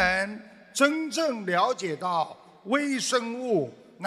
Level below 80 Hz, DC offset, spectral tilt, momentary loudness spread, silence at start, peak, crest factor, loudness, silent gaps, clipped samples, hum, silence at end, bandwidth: -58 dBFS; under 0.1%; -3.5 dB/octave; 11 LU; 0 s; -8 dBFS; 20 dB; -27 LUFS; none; under 0.1%; none; 0 s; 15 kHz